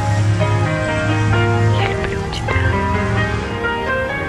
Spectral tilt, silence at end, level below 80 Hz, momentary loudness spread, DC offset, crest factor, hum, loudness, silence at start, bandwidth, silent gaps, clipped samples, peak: -6.5 dB/octave; 0 s; -30 dBFS; 5 LU; under 0.1%; 14 dB; none; -17 LUFS; 0 s; 10.5 kHz; none; under 0.1%; -2 dBFS